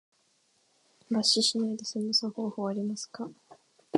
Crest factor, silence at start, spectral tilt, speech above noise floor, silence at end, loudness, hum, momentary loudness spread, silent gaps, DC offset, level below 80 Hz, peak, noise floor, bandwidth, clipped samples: 24 dB; 1.1 s; -3.5 dB/octave; 40 dB; 0 s; -29 LUFS; none; 15 LU; none; under 0.1%; -82 dBFS; -8 dBFS; -70 dBFS; 11.5 kHz; under 0.1%